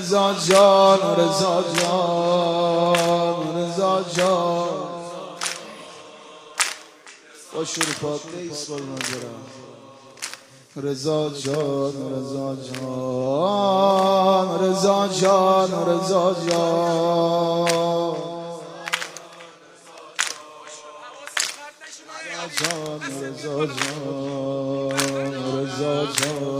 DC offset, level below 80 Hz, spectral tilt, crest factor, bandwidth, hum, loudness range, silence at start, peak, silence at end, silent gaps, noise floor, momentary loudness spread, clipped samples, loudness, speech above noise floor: under 0.1%; -68 dBFS; -4 dB/octave; 22 dB; 16 kHz; none; 10 LU; 0 s; 0 dBFS; 0 s; none; -46 dBFS; 18 LU; under 0.1%; -21 LUFS; 26 dB